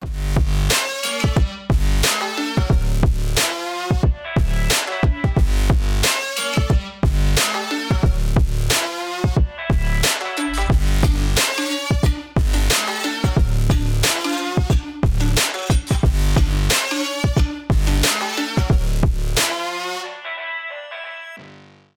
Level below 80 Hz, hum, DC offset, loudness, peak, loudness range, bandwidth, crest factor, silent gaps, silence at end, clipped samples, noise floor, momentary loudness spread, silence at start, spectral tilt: -20 dBFS; none; under 0.1%; -19 LUFS; -2 dBFS; 1 LU; 18.5 kHz; 16 dB; none; 0.4 s; under 0.1%; -45 dBFS; 5 LU; 0 s; -4 dB/octave